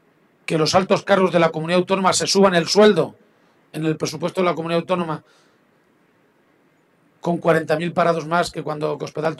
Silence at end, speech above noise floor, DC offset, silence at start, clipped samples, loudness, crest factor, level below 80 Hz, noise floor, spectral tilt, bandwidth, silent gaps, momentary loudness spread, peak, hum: 0.05 s; 40 dB; under 0.1%; 0.5 s; under 0.1%; -19 LUFS; 16 dB; -60 dBFS; -59 dBFS; -4.5 dB/octave; 13 kHz; none; 10 LU; -4 dBFS; none